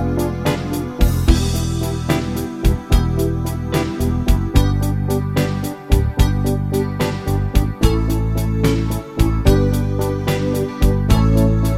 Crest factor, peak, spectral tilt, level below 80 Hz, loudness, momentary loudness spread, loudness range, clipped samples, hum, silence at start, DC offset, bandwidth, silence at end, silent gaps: 16 dB; 0 dBFS; -6.5 dB/octave; -20 dBFS; -18 LUFS; 5 LU; 1 LU; under 0.1%; none; 0 s; under 0.1%; 16.5 kHz; 0 s; none